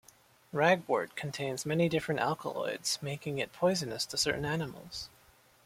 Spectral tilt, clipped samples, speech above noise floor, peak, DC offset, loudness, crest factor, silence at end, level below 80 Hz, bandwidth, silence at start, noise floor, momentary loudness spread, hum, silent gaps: -4 dB/octave; under 0.1%; 30 dB; -12 dBFS; under 0.1%; -32 LUFS; 22 dB; 0.6 s; -64 dBFS; 16.5 kHz; 0.55 s; -62 dBFS; 11 LU; none; none